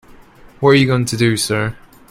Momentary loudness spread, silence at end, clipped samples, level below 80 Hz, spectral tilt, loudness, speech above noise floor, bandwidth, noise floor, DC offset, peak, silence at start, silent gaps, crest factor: 8 LU; 0.35 s; under 0.1%; -46 dBFS; -5 dB/octave; -15 LUFS; 28 dB; 16 kHz; -42 dBFS; under 0.1%; 0 dBFS; 0.6 s; none; 16 dB